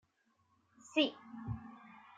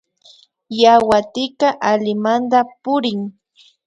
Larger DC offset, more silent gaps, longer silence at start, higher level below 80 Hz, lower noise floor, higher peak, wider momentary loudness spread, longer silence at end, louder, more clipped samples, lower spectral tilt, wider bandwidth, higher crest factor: neither; neither; first, 0.85 s vs 0.7 s; second, -66 dBFS vs -56 dBFS; first, -76 dBFS vs -50 dBFS; second, -18 dBFS vs 0 dBFS; first, 20 LU vs 13 LU; second, 0.2 s vs 0.55 s; second, -37 LUFS vs -16 LUFS; neither; about the same, -5 dB/octave vs -5 dB/octave; second, 9.2 kHz vs 11 kHz; first, 24 dB vs 16 dB